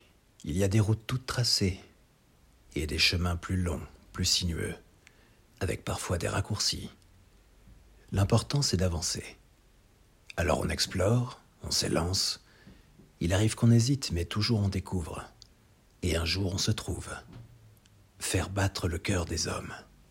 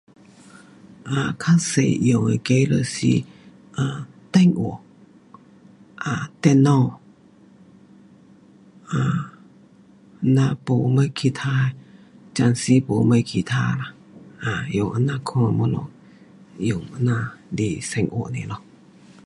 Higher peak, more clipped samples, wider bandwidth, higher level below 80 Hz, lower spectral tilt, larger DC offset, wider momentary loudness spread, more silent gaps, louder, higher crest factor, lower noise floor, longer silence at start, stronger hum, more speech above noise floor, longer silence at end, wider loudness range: second, -10 dBFS vs -2 dBFS; neither; first, 16 kHz vs 11.5 kHz; about the same, -50 dBFS vs -54 dBFS; second, -4.5 dB/octave vs -6.5 dB/octave; neither; about the same, 14 LU vs 13 LU; neither; second, -30 LUFS vs -21 LUFS; about the same, 20 dB vs 20 dB; first, -63 dBFS vs -51 dBFS; second, 0.4 s vs 1.05 s; neither; about the same, 33 dB vs 31 dB; second, 0.25 s vs 0.7 s; about the same, 5 LU vs 5 LU